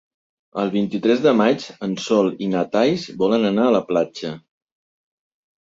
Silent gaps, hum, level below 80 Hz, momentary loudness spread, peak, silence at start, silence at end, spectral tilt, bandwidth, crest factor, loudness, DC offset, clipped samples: none; none; -62 dBFS; 11 LU; -4 dBFS; 0.55 s; 1.3 s; -6 dB/octave; 7.8 kHz; 16 dB; -19 LUFS; under 0.1%; under 0.1%